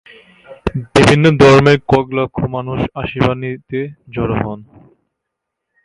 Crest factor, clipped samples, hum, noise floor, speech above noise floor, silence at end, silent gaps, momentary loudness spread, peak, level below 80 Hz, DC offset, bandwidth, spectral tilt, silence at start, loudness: 14 dB; under 0.1%; none; -77 dBFS; 64 dB; 1.2 s; none; 16 LU; 0 dBFS; -38 dBFS; under 0.1%; 11.5 kHz; -6.5 dB/octave; 0.5 s; -14 LUFS